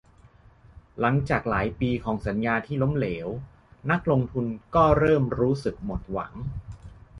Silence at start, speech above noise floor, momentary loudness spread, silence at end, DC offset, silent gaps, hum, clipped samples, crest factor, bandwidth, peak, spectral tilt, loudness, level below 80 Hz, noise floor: 0.75 s; 29 dB; 15 LU; 0 s; under 0.1%; none; none; under 0.1%; 20 dB; 10.5 kHz; -6 dBFS; -8.5 dB/octave; -25 LUFS; -42 dBFS; -54 dBFS